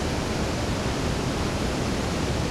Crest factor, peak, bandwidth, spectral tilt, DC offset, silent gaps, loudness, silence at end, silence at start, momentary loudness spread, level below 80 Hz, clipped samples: 12 dB; -14 dBFS; 16 kHz; -5 dB/octave; under 0.1%; none; -27 LUFS; 0 s; 0 s; 0 LU; -34 dBFS; under 0.1%